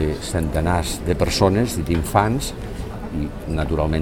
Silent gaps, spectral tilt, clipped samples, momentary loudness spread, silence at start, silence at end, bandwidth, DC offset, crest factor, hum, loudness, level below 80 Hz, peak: none; -5.5 dB/octave; under 0.1%; 11 LU; 0 s; 0 s; 18 kHz; 0.4%; 20 dB; none; -22 LUFS; -30 dBFS; 0 dBFS